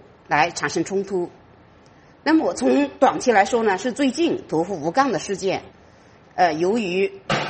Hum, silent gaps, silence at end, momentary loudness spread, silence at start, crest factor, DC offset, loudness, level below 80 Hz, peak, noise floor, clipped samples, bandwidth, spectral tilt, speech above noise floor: none; none; 0 s; 8 LU; 0.3 s; 20 dB; under 0.1%; -21 LUFS; -58 dBFS; -2 dBFS; -50 dBFS; under 0.1%; 8.8 kHz; -4.5 dB/octave; 30 dB